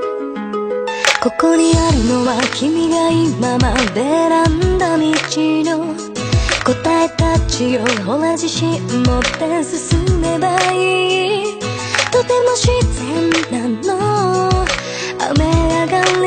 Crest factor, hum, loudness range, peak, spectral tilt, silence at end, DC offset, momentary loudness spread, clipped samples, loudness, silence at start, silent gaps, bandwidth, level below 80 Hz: 14 dB; none; 2 LU; 0 dBFS; -5 dB/octave; 0 s; under 0.1%; 6 LU; under 0.1%; -15 LUFS; 0 s; none; 9.6 kHz; -26 dBFS